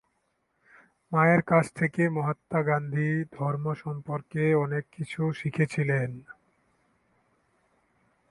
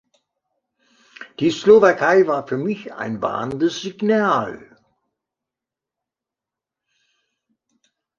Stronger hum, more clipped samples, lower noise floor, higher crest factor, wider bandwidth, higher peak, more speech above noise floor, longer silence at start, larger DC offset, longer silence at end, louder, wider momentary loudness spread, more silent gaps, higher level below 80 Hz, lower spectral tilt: neither; neither; second, -75 dBFS vs -87 dBFS; about the same, 20 dB vs 20 dB; first, 11.5 kHz vs 7.4 kHz; second, -8 dBFS vs -2 dBFS; second, 48 dB vs 69 dB; about the same, 1.1 s vs 1.2 s; neither; second, 2 s vs 3.6 s; second, -27 LUFS vs -18 LUFS; second, 11 LU vs 16 LU; neither; about the same, -66 dBFS vs -62 dBFS; first, -8 dB/octave vs -5.5 dB/octave